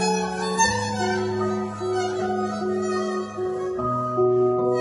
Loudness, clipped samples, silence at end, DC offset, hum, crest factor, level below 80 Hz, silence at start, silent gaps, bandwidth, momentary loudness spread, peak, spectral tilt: -24 LUFS; under 0.1%; 0 s; under 0.1%; none; 16 dB; -54 dBFS; 0 s; none; 11.5 kHz; 6 LU; -8 dBFS; -4.5 dB/octave